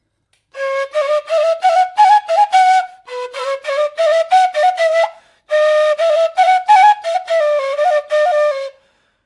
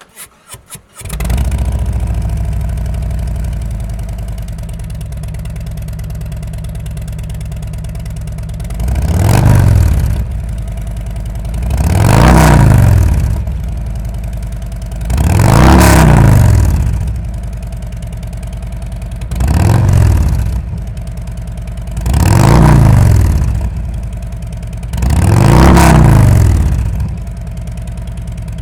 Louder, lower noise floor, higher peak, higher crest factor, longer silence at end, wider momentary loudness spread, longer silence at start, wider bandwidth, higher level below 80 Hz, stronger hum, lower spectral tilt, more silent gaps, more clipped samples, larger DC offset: about the same, -14 LUFS vs -12 LUFS; first, -64 dBFS vs -36 dBFS; about the same, 0 dBFS vs 0 dBFS; about the same, 14 dB vs 12 dB; first, 0.55 s vs 0 s; second, 11 LU vs 17 LU; first, 0.55 s vs 0.15 s; second, 11.5 kHz vs 19.5 kHz; second, -72 dBFS vs -16 dBFS; neither; second, 2 dB/octave vs -6.5 dB/octave; neither; neither; neither